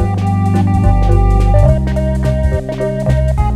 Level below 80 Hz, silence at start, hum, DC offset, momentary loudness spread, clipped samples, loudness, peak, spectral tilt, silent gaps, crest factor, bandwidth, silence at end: -16 dBFS; 0 s; none; under 0.1%; 6 LU; under 0.1%; -13 LUFS; 0 dBFS; -8.5 dB/octave; none; 12 dB; 10.5 kHz; 0 s